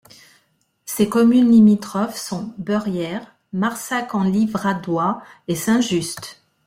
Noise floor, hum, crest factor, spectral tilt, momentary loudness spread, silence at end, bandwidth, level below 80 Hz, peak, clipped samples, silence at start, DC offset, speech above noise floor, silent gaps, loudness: -64 dBFS; none; 16 dB; -5.5 dB/octave; 17 LU; 0.35 s; 16 kHz; -58 dBFS; -4 dBFS; under 0.1%; 0.85 s; under 0.1%; 46 dB; none; -19 LUFS